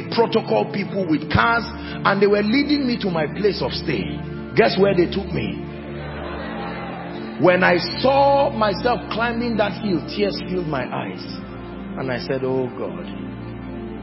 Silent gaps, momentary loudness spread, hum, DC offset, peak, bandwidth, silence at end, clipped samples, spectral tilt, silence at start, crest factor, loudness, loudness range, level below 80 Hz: none; 15 LU; none; under 0.1%; 0 dBFS; 5.8 kHz; 0 s; under 0.1%; -10 dB/octave; 0 s; 20 dB; -21 LUFS; 6 LU; -42 dBFS